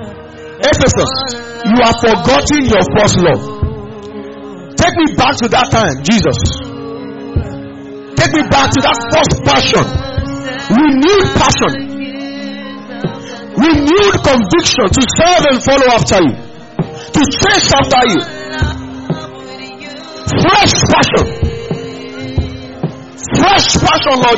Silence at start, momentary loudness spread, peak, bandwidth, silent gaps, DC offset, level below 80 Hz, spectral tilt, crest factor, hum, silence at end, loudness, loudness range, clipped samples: 0 s; 17 LU; 0 dBFS; 8.2 kHz; none; under 0.1%; -28 dBFS; -4 dB/octave; 12 dB; none; 0 s; -11 LUFS; 3 LU; under 0.1%